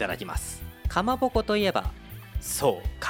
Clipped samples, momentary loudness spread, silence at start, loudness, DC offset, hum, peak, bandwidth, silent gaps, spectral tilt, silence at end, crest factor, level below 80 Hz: under 0.1%; 12 LU; 0 s; -28 LUFS; under 0.1%; none; -10 dBFS; 17 kHz; none; -4.5 dB/octave; 0 s; 18 dB; -36 dBFS